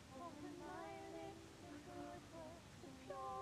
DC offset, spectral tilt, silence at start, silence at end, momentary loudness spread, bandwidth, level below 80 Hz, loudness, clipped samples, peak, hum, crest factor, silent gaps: under 0.1%; -5 dB/octave; 0 s; 0 s; 6 LU; 15 kHz; -72 dBFS; -55 LUFS; under 0.1%; -38 dBFS; none; 14 dB; none